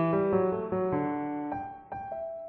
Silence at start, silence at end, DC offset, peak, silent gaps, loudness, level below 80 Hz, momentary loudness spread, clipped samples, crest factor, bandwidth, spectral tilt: 0 s; 0 s; under 0.1%; -16 dBFS; none; -31 LUFS; -60 dBFS; 12 LU; under 0.1%; 14 dB; 4.2 kHz; -8.5 dB/octave